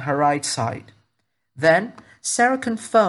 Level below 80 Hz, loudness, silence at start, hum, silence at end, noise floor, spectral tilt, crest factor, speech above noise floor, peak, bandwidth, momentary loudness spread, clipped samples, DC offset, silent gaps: -68 dBFS; -21 LUFS; 0 s; none; 0 s; -74 dBFS; -4 dB/octave; 18 dB; 54 dB; -4 dBFS; 12 kHz; 12 LU; under 0.1%; under 0.1%; none